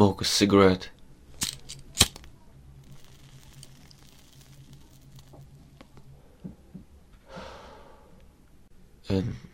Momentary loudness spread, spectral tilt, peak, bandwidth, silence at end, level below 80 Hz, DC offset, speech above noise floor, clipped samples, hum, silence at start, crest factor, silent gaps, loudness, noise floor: 29 LU; -4 dB/octave; -2 dBFS; 16 kHz; 0.15 s; -50 dBFS; under 0.1%; 31 dB; under 0.1%; none; 0 s; 30 dB; none; -24 LUFS; -54 dBFS